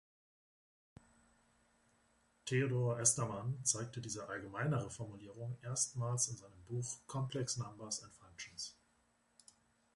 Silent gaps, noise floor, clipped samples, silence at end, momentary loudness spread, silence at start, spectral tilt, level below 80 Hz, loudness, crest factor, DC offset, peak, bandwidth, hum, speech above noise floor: none; -76 dBFS; under 0.1%; 1.25 s; 16 LU; 2.45 s; -4 dB/octave; -72 dBFS; -39 LUFS; 24 dB; under 0.1%; -18 dBFS; 11.5 kHz; none; 36 dB